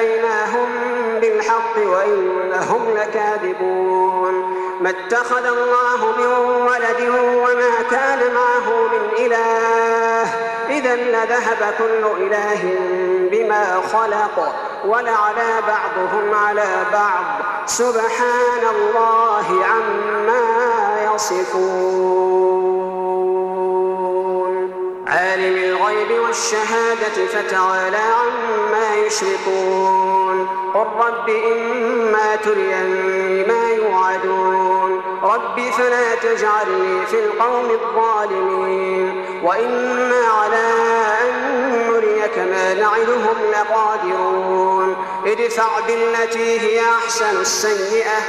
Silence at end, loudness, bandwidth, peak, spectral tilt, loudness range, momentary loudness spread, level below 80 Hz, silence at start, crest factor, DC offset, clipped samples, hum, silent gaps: 0 s; -17 LUFS; 13.5 kHz; -4 dBFS; -3 dB/octave; 2 LU; 4 LU; -62 dBFS; 0 s; 14 dB; under 0.1%; under 0.1%; none; none